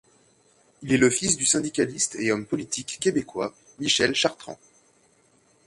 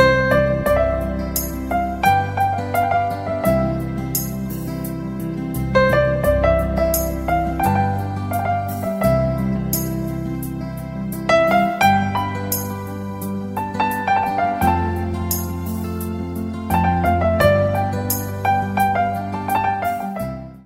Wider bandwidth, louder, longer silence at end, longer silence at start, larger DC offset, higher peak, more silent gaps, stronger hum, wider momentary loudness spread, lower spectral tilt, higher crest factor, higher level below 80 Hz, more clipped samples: second, 11.5 kHz vs 16.5 kHz; second, -24 LUFS vs -20 LUFS; first, 1.15 s vs 0.05 s; first, 0.8 s vs 0 s; neither; second, -6 dBFS vs -2 dBFS; neither; neither; first, 13 LU vs 10 LU; second, -2.5 dB/octave vs -5.5 dB/octave; about the same, 20 dB vs 18 dB; second, -60 dBFS vs -34 dBFS; neither